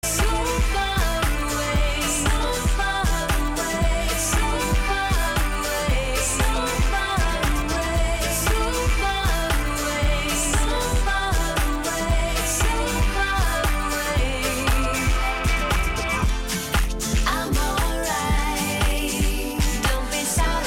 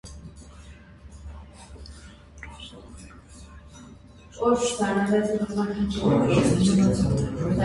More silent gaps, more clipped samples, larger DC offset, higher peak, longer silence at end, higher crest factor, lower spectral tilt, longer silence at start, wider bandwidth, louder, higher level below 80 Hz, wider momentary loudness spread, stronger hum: neither; neither; neither; second, -12 dBFS vs -8 dBFS; about the same, 0 s vs 0 s; second, 10 dB vs 18 dB; second, -3.5 dB/octave vs -6 dB/octave; about the same, 0.05 s vs 0.05 s; first, 16.5 kHz vs 11.5 kHz; about the same, -23 LUFS vs -23 LUFS; first, -24 dBFS vs -42 dBFS; second, 2 LU vs 26 LU; neither